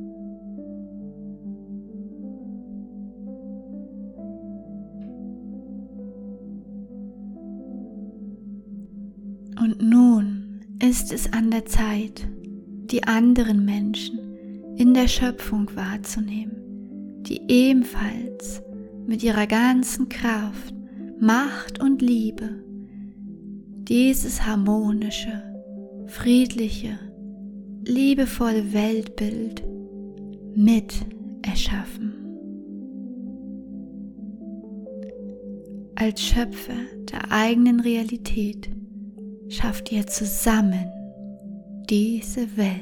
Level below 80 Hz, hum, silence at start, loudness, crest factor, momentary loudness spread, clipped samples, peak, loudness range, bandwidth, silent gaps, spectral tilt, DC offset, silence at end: -36 dBFS; none; 0 s; -22 LUFS; 18 dB; 20 LU; under 0.1%; -6 dBFS; 16 LU; 18.5 kHz; none; -5 dB/octave; under 0.1%; 0 s